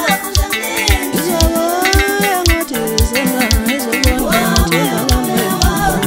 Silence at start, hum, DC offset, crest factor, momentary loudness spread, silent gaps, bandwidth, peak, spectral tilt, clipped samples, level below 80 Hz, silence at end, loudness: 0 s; none; under 0.1%; 14 dB; 3 LU; none; 16.5 kHz; 0 dBFS; -4 dB/octave; under 0.1%; -20 dBFS; 0 s; -14 LUFS